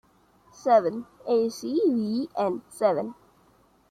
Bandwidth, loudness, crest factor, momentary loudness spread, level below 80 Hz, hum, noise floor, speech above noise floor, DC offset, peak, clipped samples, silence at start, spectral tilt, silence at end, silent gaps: 14 kHz; -26 LUFS; 18 dB; 10 LU; -70 dBFS; none; -61 dBFS; 36 dB; under 0.1%; -8 dBFS; under 0.1%; 0.6 s; -6 dB/octave; 0.8 s; none